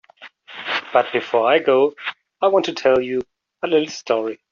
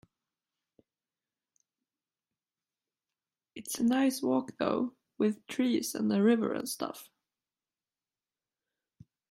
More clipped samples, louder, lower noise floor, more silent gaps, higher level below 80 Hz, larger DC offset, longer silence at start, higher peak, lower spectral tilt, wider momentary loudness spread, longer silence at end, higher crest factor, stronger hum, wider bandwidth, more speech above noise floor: neither; first, -19 LUFS vs -31 LUFS; second, -44 dBFS vs under -90 dBFS; neither; first, -64 dBFS vs -78 dBFS; neither; second, 0.2 s vs 3.55 s; first, -2 dBFS vs -14 dBFS; second, -2 dB/octave vs -5 dB/octave; about the same, 14 LU vs 13 LU; second, 0.15 s vs 2.25 s; about the same, 16 dB vs 20 dB; neither; second, 7.4 kHz vs 15.5 kHz; second, 26 dB vs over 60 dB